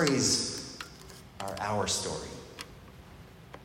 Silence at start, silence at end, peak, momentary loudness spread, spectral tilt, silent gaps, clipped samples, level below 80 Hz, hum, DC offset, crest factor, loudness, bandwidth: 0 s; 0 s; -10 dBFS; 25 LU; -3 dB/octave; none; under 0.1%; -56 dBFS; none; under 0.1%; 24 dB; -31 LUFS; 16 kHz